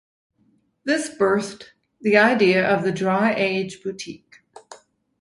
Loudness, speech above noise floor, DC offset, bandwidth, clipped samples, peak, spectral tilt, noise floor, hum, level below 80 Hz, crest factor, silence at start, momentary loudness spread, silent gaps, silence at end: -20 LUFS; 43 dB; under 0.1%; 11.5 kHz; under 0.1%; -2 dBFS; -5 dB/octave; -64 dBFS; none; -64 dBFS; 20 dB; 0.85 s; 17 LU; none; 0.45 s